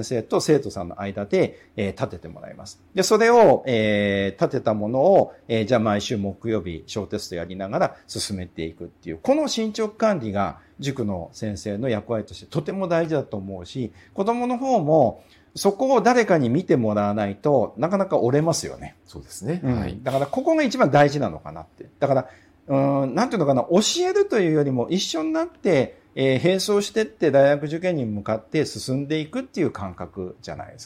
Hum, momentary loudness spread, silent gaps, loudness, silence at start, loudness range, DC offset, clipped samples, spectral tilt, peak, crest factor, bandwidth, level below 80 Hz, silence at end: none; 14 LU; none; -22 LUFS; 0 s; 6 LU; under 0.1%; under 0.1%; -5.5 dB/octave; -6 dBFS; 16 dB; 16 kHz; -54 dBFS; 0 s